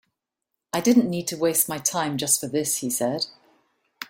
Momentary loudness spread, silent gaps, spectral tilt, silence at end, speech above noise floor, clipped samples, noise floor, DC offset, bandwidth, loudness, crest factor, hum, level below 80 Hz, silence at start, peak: 8 LU; none; -3.5 dB/octave; 0.05 s; 59 dB; under 0.1%; -82 dBFS; under 0.1%; 16.5 kHz; -23 LUFS; 18 dB; none; -66 dBFS; 0.75 s; -6 dBFS